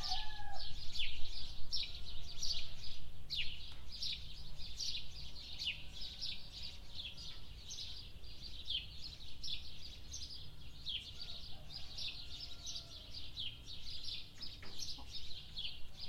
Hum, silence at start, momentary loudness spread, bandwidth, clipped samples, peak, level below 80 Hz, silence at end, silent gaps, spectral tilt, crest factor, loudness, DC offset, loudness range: none; 0 s; 9 LU; 12 kHz; under 0.1%; -20 dBFS; -50 dBFS; 0 s; none; -1.5 dB/octave; 16 dB; -45 LUFS; under 0.1%; 3 LU